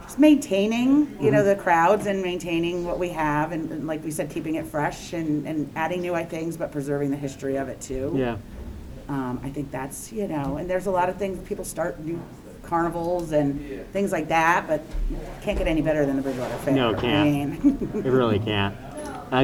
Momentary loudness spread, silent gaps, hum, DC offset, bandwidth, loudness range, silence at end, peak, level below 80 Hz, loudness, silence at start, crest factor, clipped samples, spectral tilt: 12 LU; none; none; under 0.1%; 17 kHz; 7 LU; 0 s; -4 dBFS; -40 dBFS; -25 LUFS; 0 s; 20 dB; under 0.1%; -6 dB/octave